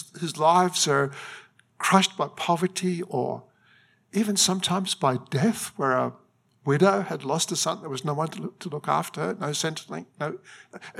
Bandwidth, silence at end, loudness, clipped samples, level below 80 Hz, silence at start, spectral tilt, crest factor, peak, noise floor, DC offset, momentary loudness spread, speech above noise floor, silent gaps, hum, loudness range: 16 kHz; 0 s; -25 LUFS; under 0.1%; -76 dBFS; 0 s; -4 dB/octave; 22 dB; -4 dBFS; -60 dBFS; under 0.1%; 14 LU; 35 dB; none; none; 4 LU